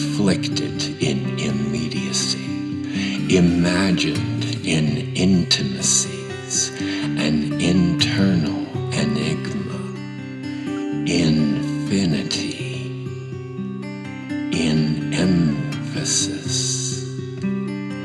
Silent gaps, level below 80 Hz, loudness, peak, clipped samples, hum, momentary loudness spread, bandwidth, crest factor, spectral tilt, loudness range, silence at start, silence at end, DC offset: none; -48 dBFS; -21 LUFS; -4 dBFS; under 0.1%; none; 12 LU; 12 kHz; 18 dB; -4.5 dB/octave; 4 LU; 0 s; 0 s; under 0.1%